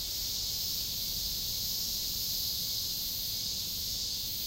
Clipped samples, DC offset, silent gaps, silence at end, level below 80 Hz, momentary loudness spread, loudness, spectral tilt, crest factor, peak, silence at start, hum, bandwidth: under 0.1%; under 0.1%; none; 0 s; -50 dBFS; 2 LU; -31 LUFS; -0.5 dB/octave; 14 dB; -20 dBFS; 0 s; none; 16 kHz